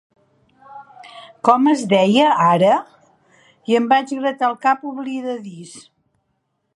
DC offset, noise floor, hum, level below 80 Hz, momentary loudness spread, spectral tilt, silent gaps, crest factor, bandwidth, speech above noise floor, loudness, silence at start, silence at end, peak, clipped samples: under 0.1%; -71 dBFS; none; -70 dBFS; 20 LU; -5.5 dB/octave; none; 18 dB; 11.5 kHz; 54 dB; -17 LUFS; 0.7 s; 0.95 s; 0 dBFS; under 0.1%